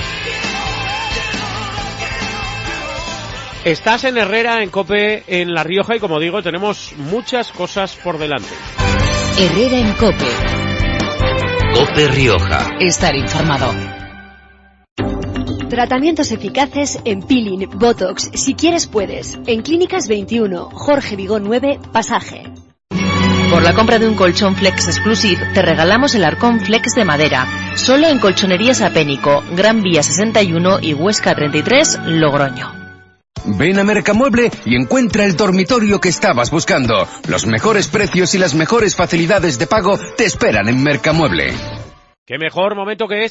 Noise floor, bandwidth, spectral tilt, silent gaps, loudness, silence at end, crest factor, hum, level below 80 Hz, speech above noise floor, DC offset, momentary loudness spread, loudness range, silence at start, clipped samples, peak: -46 dBFS; 8.2 kHz; -4.5 dB/octave; 14.91-14.96 s, 42.18-42.26 s; -14 LUFS; 0 s; 14 dB; none; -32 dBFS; 32 dB; under 0.1%; 10 LU; 6 LU; 0 s; under 0.1%; 0 dBFS